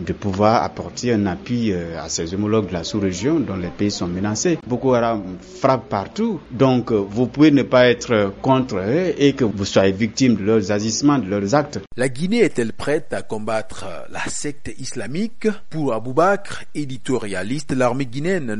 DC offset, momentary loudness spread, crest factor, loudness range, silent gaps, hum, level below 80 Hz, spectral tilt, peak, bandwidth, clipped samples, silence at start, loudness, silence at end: under 0.1%; 10 LU; 18 dB; 6 LU; none; none; -48 dBFS; -5.5 dB/octave; -2 dBFS; 11.5 kHz; under 0.1%; 0 s; -20 LUFS; 0 s